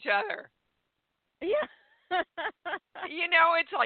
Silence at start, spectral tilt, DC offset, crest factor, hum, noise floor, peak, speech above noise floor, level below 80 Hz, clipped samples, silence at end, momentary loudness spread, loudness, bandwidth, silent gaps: 0 s; 2 dB/octave; under 0.1%; 20 dB; none; -81 dBFS; -10 dBFS; 53 dB; -74 dBFS; under 0.1%; 0 s; 16 LU; -29 LUFS; 4.7 kHz; none